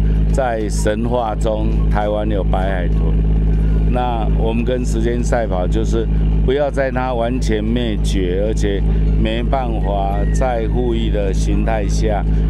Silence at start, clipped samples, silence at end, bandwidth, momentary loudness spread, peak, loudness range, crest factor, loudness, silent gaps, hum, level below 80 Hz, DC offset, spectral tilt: 0 s; under 0.1%; 0 s; 10 kHz; 2 LU; -4 dBFS; 0 LU; 12 dB; -18 LUFS; none; none; -18 dBFS; under 0.1%; -7 dB/octave